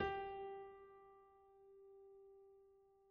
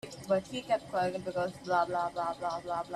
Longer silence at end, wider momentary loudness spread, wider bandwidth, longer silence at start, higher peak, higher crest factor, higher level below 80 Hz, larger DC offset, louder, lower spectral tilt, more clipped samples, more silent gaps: about the same, 0 s vs 0 s; first, 20 LU vs 5 LU; second, 5.2 kHz vs 13 kHz; about the same, 0 s vs 0.05 s; second, -28 dBFS vs -16 dBFS; first, 24 dB vs 18 dB; about the same, -72 dBFS vs -68 dBFS; neither; second, -52 LUFS vs -33 LUFS; second, -3 dB/octave vs -5 dB/octave; neither; neither